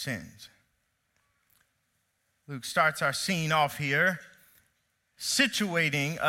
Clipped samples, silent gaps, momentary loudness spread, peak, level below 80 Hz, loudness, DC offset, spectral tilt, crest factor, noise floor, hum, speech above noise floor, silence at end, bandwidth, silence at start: under 0.1%; none; 14 LU; -10 dBFS; -68 dBFS; -27 LUFS; under 0.1%; -3.5 dB/octave; 22 dB; -76 dBFS; none; 47 dB; 0 s; 16.5 kHz; 0 s